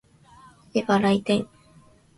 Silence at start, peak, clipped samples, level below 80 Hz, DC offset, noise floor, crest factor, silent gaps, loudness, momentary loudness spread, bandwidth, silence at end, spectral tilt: 0.75 s; -6 dBFS; under 0.1%; -60 dBFS; under 0.1%; -55 dBFS; 20 dB; none; -23 LUFS; 8 LU; 11.5 kHz; 0.75 s; -6 dB/octave